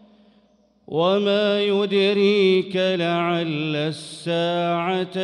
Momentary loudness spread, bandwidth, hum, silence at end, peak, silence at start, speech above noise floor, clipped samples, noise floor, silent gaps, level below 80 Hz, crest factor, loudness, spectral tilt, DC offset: 8 LU; 11 kHz; none; 0 s; -8 dBFS; 0.9 s; 39 dB; under 0.1%; -59 dBFS; none; -68 dBFS; 14 dB; -21 LUFS; -6 dB/octave; under 0.1%